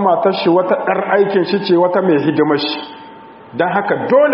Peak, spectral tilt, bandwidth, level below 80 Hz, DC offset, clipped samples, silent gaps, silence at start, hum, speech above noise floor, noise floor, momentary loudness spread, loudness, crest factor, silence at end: 0 dBFS; -4 dB/octave; 5.8 kHz; -62 dBFS; under 0.1%; under 0.1%; none; 0 s; none; 23 dB; -37 dBFS; 9 LU; -14 LUFS; 14 dB; 0 s